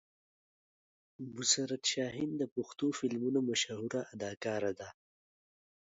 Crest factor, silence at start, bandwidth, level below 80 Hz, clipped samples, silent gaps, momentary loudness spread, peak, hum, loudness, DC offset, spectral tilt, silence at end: 24 dB; 1.2 s; 7.6 kHz; -76 dBFS; under 0.1%; 2.52-2.56 s; 12 LU; -14 dBFS; none; -35 LUFS; under 0.1%; -3.5 dB/octave; 0.95 s